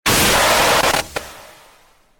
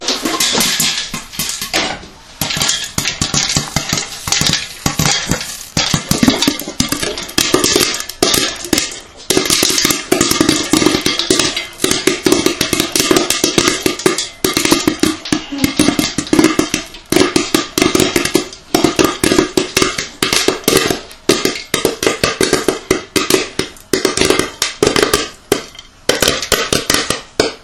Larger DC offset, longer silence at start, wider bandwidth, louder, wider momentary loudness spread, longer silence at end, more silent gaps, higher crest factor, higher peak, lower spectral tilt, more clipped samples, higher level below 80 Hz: neither; about the same, 0.05 s vs 0 s; about the same, 19 kHz vs over 20 kHz; about the same, -14 LUFS vs -14 LUFS; first, 17 LU vs 7 LU; first, 0.8 s vs 0.05 s; neither; about the same, 14 dB vs 16 dB; second, -4 dBFS vs 0 dBFS; about the same, -2 dB/octave vs -2.5 dB/octave; second, under 0.1% vs 0.3%; about the same, -36 dBFS vs -38 dBFS